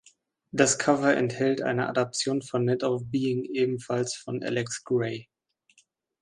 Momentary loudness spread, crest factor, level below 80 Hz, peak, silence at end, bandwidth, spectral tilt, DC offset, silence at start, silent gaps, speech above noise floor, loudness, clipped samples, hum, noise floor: 8 LU; 22 dB; -68 dBFS; -6 dBFS; 1 s; 11.5 kHz; -4.5 dB/octave; under 0.1%; 0.55 s; none; 40 dB; -27 LUFS; under 0.1%; none; -66 dBFS